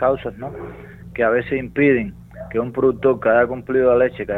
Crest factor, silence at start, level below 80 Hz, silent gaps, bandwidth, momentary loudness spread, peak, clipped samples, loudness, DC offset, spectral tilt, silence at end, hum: 16 dB; 0 s; -44 dBFS; none; 4.1 kHz; 17 LU; -4 dBFS; under 0.1%; -18 LUFS; under 0.1%; -9 dB/octave; 0 s; none